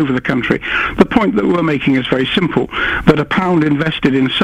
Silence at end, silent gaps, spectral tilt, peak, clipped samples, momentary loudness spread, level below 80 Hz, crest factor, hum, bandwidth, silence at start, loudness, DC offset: 0 s; none; -7 dB/octave; 0 dBFS; 0.2%; 4 LU; -36 dBFS; 14 dB; none; 10.5 kHz; 0 s; -14 LUFS; under 0.1%